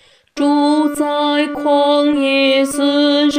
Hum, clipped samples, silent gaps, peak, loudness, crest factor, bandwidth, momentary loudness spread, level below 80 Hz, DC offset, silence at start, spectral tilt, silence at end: none; under 0.1%; none; -2 dBFS; -14 LUFS; 12 dB; 16 kHz; 4 LU; -56 dBFS; under 0.1%; 0.35 s; -2.5 dB/octave; 0 s